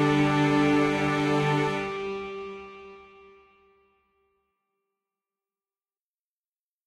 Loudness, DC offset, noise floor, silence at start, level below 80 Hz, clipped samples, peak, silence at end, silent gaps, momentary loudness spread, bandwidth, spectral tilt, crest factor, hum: -25 LUFS; under 0.1%; under -90 dBFS; 0 s; -58 dBFS; under 0.1%; -10 dBFS; 3.85 s; none; 18 LU; 11.5 kHz; -6.5 dB/octave; 18 dB; none